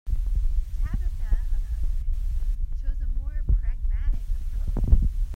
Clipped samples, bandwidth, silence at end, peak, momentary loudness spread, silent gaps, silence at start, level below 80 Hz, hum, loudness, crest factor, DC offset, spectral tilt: under 0.1%; 2.3 kHz; 0 s; -4 dBFS; 8 LU; none; 0.05 s; -24 dBFS; none; -30 LUFS; 20 dB; under 0.1%; -8 dB/octave